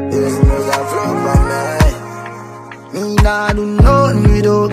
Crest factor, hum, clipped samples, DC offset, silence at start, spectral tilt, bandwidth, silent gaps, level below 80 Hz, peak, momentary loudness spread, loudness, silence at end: 12 dB; none; under 0.1%; under 0.1%; 0 s; -6.5 dB/octave; 15 kHz; none; -18 dBFS; 0 dBFS; 17 LU; -13 LUFS; 0 s